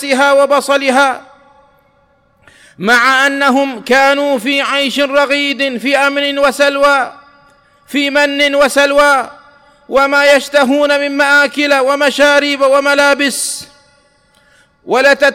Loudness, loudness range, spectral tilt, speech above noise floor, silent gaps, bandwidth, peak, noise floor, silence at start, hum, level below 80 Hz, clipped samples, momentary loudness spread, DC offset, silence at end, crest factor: -11 LUFS; 3 LU; -2 dB/octave; 42 dB; none; 16.5 kHz; -2 dBFS; -53 dBFS; 0 s; none; -52 dBFS; under 0.1%; 6 LU; under 0.1%; 0 s; 10 dB